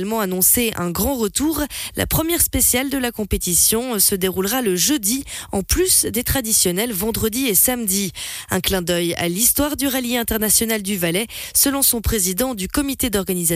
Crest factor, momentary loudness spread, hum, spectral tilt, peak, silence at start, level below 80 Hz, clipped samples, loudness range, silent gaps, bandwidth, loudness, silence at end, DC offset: 16 dB; 8 LU; none; -3 dB/octave; -2 dBFS; 0 s; -36 dBFS; under 0.1%; 1 LU; none; 16 kHz; -18 LUFS; 0 s; under 0.1%